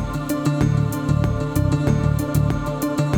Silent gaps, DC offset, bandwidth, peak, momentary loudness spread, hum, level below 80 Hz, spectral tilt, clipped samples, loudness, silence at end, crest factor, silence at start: none; under 0.1%; 19 kHz; -8 dBFS; 4 LU; none; -32 dBFS; -7.5 dB/octave; under 0.1%; -21 LUFS; 0 s; 12 dB; 0 s